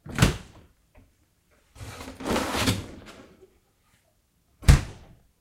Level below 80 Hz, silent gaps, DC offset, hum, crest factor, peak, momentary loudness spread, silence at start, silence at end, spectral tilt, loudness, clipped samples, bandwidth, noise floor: -32 dBFS; none; under 0.1%; none; 26 dB; -2 dBFS; 23 LU; 0.05 s; 0.45 s; -5 dB/octave; -25 LUFS; under 0.1%; 16 kHz; -67 dBFS